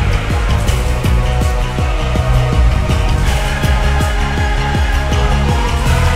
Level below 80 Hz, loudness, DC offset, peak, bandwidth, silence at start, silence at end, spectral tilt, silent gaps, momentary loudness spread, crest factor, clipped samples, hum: -14 dBFS; -15 LUFS; under 0.1%; 0 dBFS; 15.5 kHz; 0 s; 0 s; -5.5 dB/octave; none; 2 LU; 12 dB; under 0.1%; none